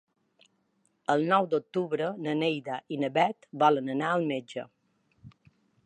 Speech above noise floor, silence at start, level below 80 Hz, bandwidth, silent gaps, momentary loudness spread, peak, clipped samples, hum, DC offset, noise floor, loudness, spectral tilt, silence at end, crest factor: 45 dB; 1.1 s; -78 dBFS; 10 kHz; none; 11 LU; -10 dBFS; under 0.1%; none; under 0.1%; -73 dBFS; -28 LUFS; -6.5 dB/octave; 0.55 s; 20 dB